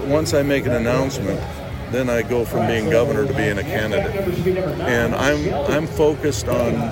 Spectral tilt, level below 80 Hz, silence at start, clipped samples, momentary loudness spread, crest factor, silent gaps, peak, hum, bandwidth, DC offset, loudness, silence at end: -6 dB/octave; -36 dBFS; 0 s; under 0.1%; 5 LU; 14 dB; none; -6 dBFS; none; 16.5 kHz; under 0.1%; -20 LUFS; 0 s